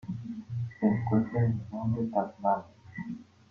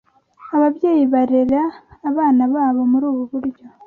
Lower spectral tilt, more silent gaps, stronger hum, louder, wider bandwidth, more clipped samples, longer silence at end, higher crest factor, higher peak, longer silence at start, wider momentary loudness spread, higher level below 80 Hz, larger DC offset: first, -10.5 dB/octave vs -9 dB/octave; neither; neither; second, -31 LUFS vs -17 LUFS; first, 5.8 kHz vs 4.4 kHz; neither; about the same, 0.25 s vs 0.2 s; first, 18 dB vs 12 dB; second, -14 dBFS vs -4 dBFS; second, 0.05 s vs 0.4 s; first, 14 LU vs 10 LU; about the same, -62 dBFS vs -58 dBFS; neither